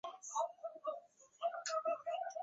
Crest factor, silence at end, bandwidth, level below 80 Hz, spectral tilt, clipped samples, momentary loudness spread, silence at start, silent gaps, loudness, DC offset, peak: 16 dB; 0 s; 7.6 kHz; under -90 dBFS; 1.5 dB/octave; under 0.1%; 7 LU; 0.05 s; none; -42 LUFS; under 0.1%; -26 dBFS